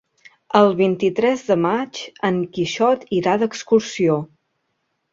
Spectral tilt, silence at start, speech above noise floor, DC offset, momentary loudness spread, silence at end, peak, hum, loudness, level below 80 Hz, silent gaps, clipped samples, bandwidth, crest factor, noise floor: -5.5 dB/octave; 0.55 s; 54 dB; under 0.1%; 8 LU; 0.9 s; -2 dBFS; none; -19 LUFS; -60 dBFS; none; under 0.1%; 7.8 kHz; 18 dB; -72 dBFS